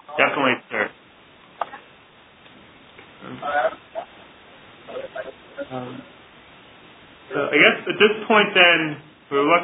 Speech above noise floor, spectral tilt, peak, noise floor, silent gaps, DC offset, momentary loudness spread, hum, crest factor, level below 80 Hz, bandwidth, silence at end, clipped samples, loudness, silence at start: 33 dB; -7.5 dB/octave; 0 dBFS; -50 dBFS; none; under 0.1%; 23 LU; none; 24 dB; -66 dBFS; 4 kHz; 0 s; under 0.1%; -18 LUFS; 0.1 s